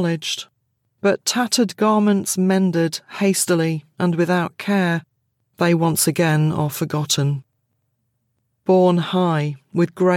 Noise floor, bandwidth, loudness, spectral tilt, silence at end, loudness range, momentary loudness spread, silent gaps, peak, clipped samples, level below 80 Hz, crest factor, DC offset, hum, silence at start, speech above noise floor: -71 dBFS; 17 kHz; -19 LUFS; -5 dB/octave; 0 s; 2 LU; 7 LU; none; -4 dBFS; under 0.1%; -68 dBFS; 16 dB; under 0.1%; none; 0 s; 52 dB